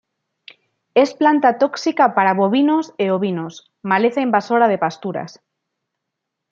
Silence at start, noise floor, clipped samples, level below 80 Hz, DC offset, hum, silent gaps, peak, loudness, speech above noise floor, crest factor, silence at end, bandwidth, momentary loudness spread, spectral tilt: 0.95 s; -79 dBFS; under 0.1%; -70 dBFS; under 0.1%; none; none; -2 dBFS; -17 LUFS; 63 dB; 16 dB; 1.2 s; 7.6 kHz; 12 LU; -6 dB/octave